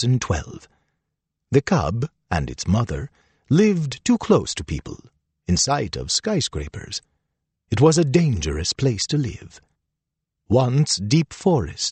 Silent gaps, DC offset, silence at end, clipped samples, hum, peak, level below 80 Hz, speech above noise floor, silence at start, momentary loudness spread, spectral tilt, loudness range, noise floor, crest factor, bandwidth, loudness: none; under 0.1%; 0 s; under 0.1%; none; -4 dBFS; -40 dBFS; 61 dB; 0 s; 14 LU; -5 dB/octave; 3 LU; -82 dBFS; 18 dB; 8.8 kHz; -21 LUFS